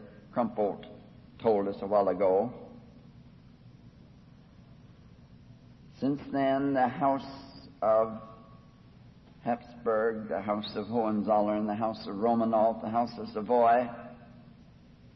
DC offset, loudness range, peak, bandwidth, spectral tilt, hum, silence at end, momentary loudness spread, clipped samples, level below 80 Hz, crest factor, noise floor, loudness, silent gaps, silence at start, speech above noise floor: under 0.1%; 6 LU; -14 dBFS; 6 kHz; -9 dB/octave; none; 0.65 s; 17 LU; under 0.1%; -62 dBFS; 18 dB; -55 dBFS; -29 LUFS; none; 0 s; 27 dB